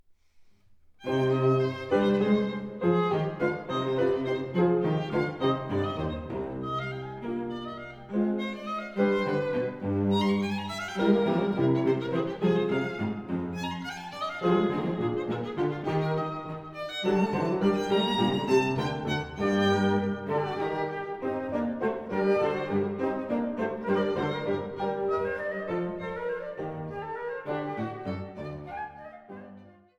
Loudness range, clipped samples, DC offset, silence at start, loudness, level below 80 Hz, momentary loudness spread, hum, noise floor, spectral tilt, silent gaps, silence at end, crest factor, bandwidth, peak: 6 LU; under 0.1%; under 0.1%; 0.35 s; -29 LUFS; -58 dBFS; 11 LU; none; -57 dBFS; -7 dB/octave; none; 0.25 s; 18 dB; 11 kHz; -10 dBFS